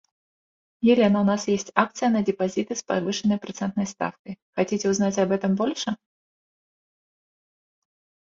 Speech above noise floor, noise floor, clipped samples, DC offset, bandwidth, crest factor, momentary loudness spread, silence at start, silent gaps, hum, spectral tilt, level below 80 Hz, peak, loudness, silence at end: over 67 dB; under -90 dBFS; under 0.1%; under 0.1%; 7.6 kHz; 24 dB; 11 LU; 0.8 s; 4.19-4.25 s, 4.42-4.53 s; none; -5 dB/octave; -64 dBFS; -2 dBFS; -24 LUFS; 2.35 s